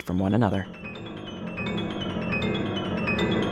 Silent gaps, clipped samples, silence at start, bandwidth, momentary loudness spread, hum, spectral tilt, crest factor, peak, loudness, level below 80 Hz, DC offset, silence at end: none; under 0.1%; 0 s; 13 kHz; 13 LU; none; -7 dB/octave; 16 dB; -10 dBFS; -28 LUFS; -48 dBFS; under 0.1%; 0 s